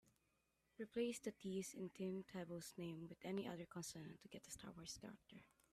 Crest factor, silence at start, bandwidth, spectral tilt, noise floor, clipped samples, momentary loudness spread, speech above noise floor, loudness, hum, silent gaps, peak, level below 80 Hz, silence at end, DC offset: 18 dB; 0.05 s; 15.5 kHz; -5 dB/octave; -85 dBFS; under 0.1%; 12 LU; 34 dB; -51 LUFS; none; none; -32 dBFS; -80 dBFS; 0.25 s; under 0.1%